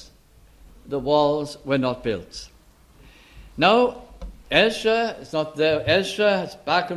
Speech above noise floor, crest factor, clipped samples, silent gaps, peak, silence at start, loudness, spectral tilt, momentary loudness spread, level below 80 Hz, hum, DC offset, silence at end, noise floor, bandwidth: 31 dB; 20 dB; under 0.1%; none; -4 dBFS; 0 s; -22 LUFS; -5 dB/octave; 19 LU; -48 dBFS; none; under 0.1%; 0 s; -53 dBFS; 13 kHz